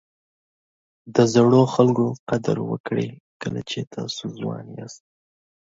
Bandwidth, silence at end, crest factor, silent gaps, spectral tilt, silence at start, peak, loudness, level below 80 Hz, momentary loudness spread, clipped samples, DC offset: 7.8 kHz; 0.7 s; 20 dB; 2.19-2.27 s, 2.80-2.84 s, 3.20-3.40 s, 3.87-3.91 s; -6.5 dB/octave; 1.05 s; -2 dBFS; -22 LUFS; -60 dBFS; 17 LU; under 0.1%; under 0.1%